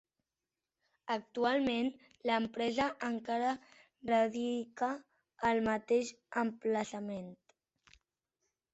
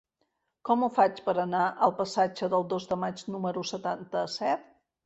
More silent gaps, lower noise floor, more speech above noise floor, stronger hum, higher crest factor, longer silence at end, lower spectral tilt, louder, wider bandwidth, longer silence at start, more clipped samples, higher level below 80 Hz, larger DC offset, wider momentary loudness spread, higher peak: neither; first, under -90 dBFS vs -78 dBFS; first, over 56 dB vs 49 dB; neither; about the same, 18 dB vs 20 dB; first, 1.4 s vs 0.45 s; about the same, -4.5 dB/octave vs -5.5 dB/octave; second, -35 LUFS vs -29 LUFS; about the same, 8.2 kHz vs 8.2 kHz; first, 1.05 s vs 0.65 s; neither; about the same, -70 dBFS vs -70 dBFS; neither; first, 11 LU vs 8 LU; second, -18 dBFS vs -8 dBFS